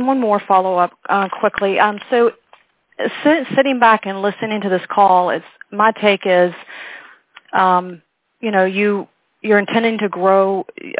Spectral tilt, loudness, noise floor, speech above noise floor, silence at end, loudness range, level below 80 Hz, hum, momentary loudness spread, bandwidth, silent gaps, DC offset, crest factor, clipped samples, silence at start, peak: -9 dB/octave; -16 LUFS; -53 dBFS; 37 dB; 0 s; 3 LU; -64 dBFS; none; 11 LU; 4 kHz; none; under 0.1%; 16 dB; under 0.1%; 0 s; 0 dBFS